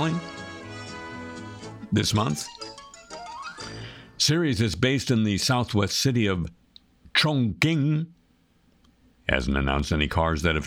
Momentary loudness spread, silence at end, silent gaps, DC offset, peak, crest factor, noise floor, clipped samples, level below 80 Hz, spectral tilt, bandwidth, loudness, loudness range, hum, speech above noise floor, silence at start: 17 LU; 0 s; none; under 0.1%; -4 dBFS; 22 dB; -62 dBFS; under 0.1%; -40 dBFS; -4.5 dB/octave; 17 kHz; -24 LUFS; 7 LU; none; 39 dB; 0 s